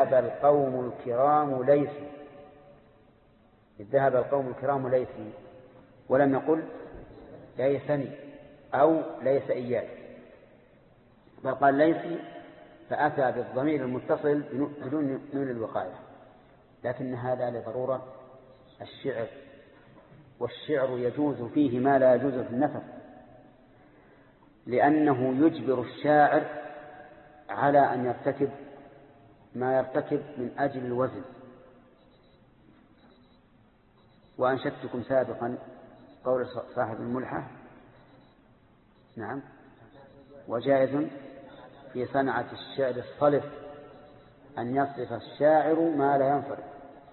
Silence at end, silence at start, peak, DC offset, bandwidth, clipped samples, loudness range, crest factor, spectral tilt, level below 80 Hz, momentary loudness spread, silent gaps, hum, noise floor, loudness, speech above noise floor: 0.15 s; 0 s; -10 dBFS; under 0.1%; 4.3 kHz; under 0.1%; 9 LU; 20 dB; -11 dB/octave; -66 dBFS; 22 LU; none; none; -61 dBFS; -28 LUFS; 34 dB